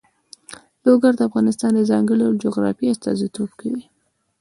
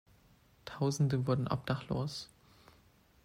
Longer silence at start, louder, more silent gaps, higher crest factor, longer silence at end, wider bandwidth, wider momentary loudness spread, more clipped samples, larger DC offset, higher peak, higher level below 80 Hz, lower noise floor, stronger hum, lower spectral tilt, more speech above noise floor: second, 0.5 s vs 0.65 s; first, -19 LUFS vs -35 LUFS; neither; about the same, 18 dB vs 18 dB; second, 0.6 s vs 1 s; second, 11.5 kHz vs 14.5 kHz; second, 13 LU vs 18 LU; neither; neither; first, -2 dBFS vs -18 dBFS; about the same, -62 dBFS vs -62 dBFS; second, -46 dBFS vs -65 dBFS; neither; about the same, -6.5 dB/octave vs -6.5 dB/octave; second, 28 dB vs 32 dB